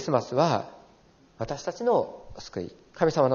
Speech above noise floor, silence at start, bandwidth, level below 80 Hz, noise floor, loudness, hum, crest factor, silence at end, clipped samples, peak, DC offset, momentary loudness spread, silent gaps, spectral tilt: 32 dB; 0 s; 7.2 kHz; -58 dBFS; -58 dBFS; -28 LUFS; none; 20 dB; 0 s; under 0.1%; -8 dBFS; under 0.1%; 16 LU; none; -5.5 dB/octave